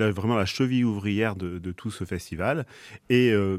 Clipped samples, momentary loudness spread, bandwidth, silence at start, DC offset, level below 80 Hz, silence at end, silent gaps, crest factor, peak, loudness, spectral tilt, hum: under 0.1%; 13 LU; 14.5 kHz; 0 s; under 0.1%; -54 dBFS; 0 s; none; 18 dB; -8 dBFS; -26 LUFS; -6.5 dB/octave; none